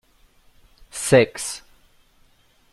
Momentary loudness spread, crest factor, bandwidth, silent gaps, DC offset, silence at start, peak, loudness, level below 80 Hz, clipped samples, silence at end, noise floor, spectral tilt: 20 LU; 22 dB; 13 kHz; none; under 0.1%; 0.95 s; -2 dBFS; -20 LUFS; -54 dBFS; under 0.1%; 1.15 s; -58 dBFS; -4.5 dB/octave